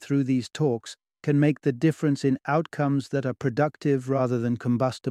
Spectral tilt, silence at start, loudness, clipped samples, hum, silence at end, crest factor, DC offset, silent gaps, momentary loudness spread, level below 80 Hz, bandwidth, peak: -7.5 dB/octave; 0 s; -25 LUFS; under 0.1%; none; 0 s; 16 dB; under 0.1%; none; 4 LU; -66 dBFS; 11.5 kHz; -10 dBFS